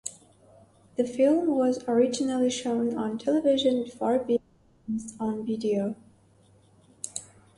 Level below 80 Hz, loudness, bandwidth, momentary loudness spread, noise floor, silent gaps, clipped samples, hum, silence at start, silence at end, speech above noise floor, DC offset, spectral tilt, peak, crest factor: -68 dBFS; -27 LUFS; 11.5 kHz; 14 LU; -59 dBFS; none; under 0.1%; none; 0.05 s; 0.35 s; 34 dB; under 0.1%; -5 dB/octave; -12 dBFS; 16 dB